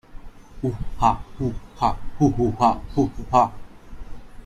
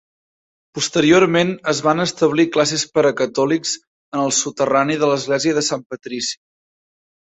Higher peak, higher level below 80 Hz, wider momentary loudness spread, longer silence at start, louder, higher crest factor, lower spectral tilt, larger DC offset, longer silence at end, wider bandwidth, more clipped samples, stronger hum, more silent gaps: about the same, -2 dBFS vs -2 dBFS; first, -36 dBFS vs -58 dBFS; second, 9 LU vs 12 LU; second, 0.1 s vs 0.75 s; second, -23 LUFS vs -18 LUFS; about the same, 20 dB vs 18 dB; first, -7.5 dB/octave vs -3.5 dB/octave; neither; second, 0 s vs 0.95 s; first, 12.5 kHz vs 8.4 kHz; neither; neither; second, none vs 3.87-4.12 s, 5.86-5.90 s